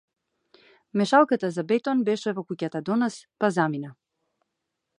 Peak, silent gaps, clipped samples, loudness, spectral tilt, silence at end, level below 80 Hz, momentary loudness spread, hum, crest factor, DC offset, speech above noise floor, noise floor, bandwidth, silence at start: -6 dBFS; none; under 0.1%; -25 LUFS; -6 dB/octave; 1.1 s; -78 dBFS; 11 LU; none; 22 dB; under 0.1%; 57 dB; -82 dBFS; 11 kHz; 0.95 s